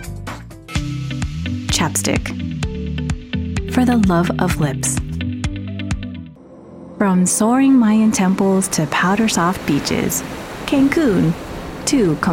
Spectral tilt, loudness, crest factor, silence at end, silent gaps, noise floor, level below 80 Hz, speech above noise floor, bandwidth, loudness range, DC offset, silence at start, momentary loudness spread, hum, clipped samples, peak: -5 dB/octave; -18 LUFS; 16 dB; 0 s; none; -39 dBFS; -34 dBFS; 24 dB; 17 kHz; 6 LU; under 0.1%; 0 s; 13 LU; none; under 0.1%; -2 dBFS